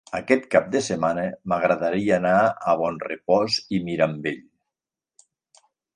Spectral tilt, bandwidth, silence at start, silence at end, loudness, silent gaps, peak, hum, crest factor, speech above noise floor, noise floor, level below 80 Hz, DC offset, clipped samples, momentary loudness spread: -5 dB/octave; 11 kHz; 0.1 s; 1.55 s; -22 LUFS; none; -2 dBFS; none; 22 dB; 65 dB; -88 dBFS; -60 dBFS; under 0.1%; under 0.1%; 8 LU